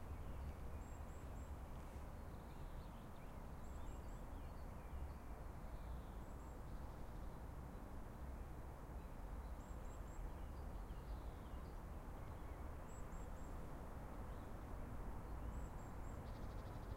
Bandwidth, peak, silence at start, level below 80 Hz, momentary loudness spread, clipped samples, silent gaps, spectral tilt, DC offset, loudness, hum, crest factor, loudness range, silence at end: 16 kHz; -36 dBFS; 0 s; -52 dBFS; 2 LU; under 0.1%; none; -7 dB/octave; under 0.1%; -54 LUFS; none; 14 dB; 2 LU; 0 s